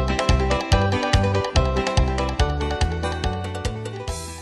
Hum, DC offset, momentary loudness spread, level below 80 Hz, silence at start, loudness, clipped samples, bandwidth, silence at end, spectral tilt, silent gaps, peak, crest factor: none; under 0.1%; 9 LU; -26 dBFS; 0 s; -22 LUFS; under 0.1%; 12.5 kHz; 0 s; -5.5 dB/octave; none; -4 dBFS; 18 dB